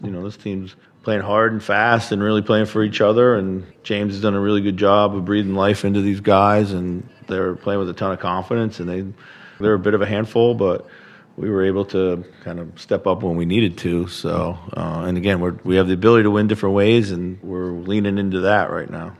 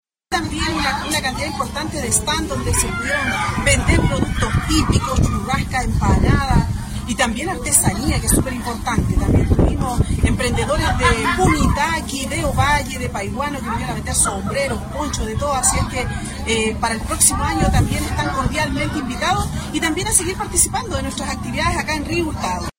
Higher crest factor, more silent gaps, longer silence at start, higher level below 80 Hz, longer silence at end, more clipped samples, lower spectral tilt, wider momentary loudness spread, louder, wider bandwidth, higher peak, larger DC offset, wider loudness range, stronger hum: about the same, 18 dB vs 18 dB; neither; second, 0 s vs 0.3 s; second, -52 dBFS vs -26 dBFS; about the same, 0.1 s vs 0.1 s; neither; first, -7 dB/octave vs -4 dB/octave; first, 12 LU vs 8 LU; about the same, -19 LUFS vs -19 LUFS; second, 12 kHz vs 16.5 kHz; about the same, 0 dBFS vs 0 dBFS; neither; about the same, 4 LU vs 2 LU; neither